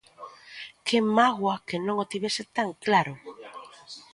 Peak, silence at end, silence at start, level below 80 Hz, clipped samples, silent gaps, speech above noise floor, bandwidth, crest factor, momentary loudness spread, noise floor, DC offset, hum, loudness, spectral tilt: -8 dBFS; 0.15 s; 0.2 s; -72 dBFS; under 0.1%; none; 21 dB; 11.5 kHz; 20 dB; 22 LU; -47 dBFS; under 0.1%; none; -26 LUFS; -4.5 dB/octave